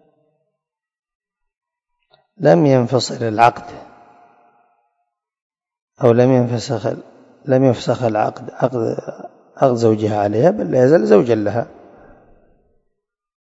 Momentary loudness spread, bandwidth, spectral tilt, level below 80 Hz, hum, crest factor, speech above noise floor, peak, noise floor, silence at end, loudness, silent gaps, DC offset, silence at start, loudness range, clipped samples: 14 LU; 8 kHz; -7 dB/octave; -60 dBFS; none; 18 dB; 65 dB; 0 dBFS; -80 dBFS; 1.8 s; -16 LUFS; 5.42-5.50 s, 5.82-5.87 s; under 0.1%; 2.4 s; 4 LU; under 0.1%